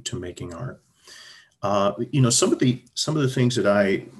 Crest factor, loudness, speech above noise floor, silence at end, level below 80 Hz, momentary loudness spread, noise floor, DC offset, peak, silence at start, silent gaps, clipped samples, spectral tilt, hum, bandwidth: 16 dB; -22 LUFS; 26 dB; 0 s; -54 dBFS; 16 LU; -48 dBFS; under 0.1%; -6 dBFS; 0.05 s; none; under 0.1%; -4.5 dB/octave; none; 12.5 kHz